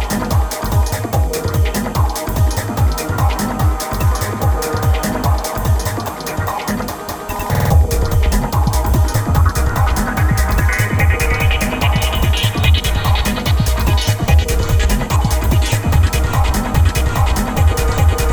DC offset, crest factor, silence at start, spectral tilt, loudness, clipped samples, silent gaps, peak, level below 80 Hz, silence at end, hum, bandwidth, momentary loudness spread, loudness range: under 0.1%; 14 dB; 0 s; -5 dB/octave; -16 LUFS; under 0.1%; none; -2 dBFS; -18 dBFS; 0 s; none; over 20 kHz; 4 LU; 3 LU